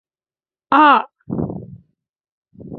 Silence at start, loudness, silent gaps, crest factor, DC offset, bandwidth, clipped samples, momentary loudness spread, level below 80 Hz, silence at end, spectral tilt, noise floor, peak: 0.7 s; -16 LUFS; 2.09-2.14 s, 2.32-2.42 s; 18 dB; under 0.1%; 5.8 kHz; under 0.1%; 16 LU; -50 dBFS; 0 s; -8 dB/octave; under -90 dBFS; -2 dBFS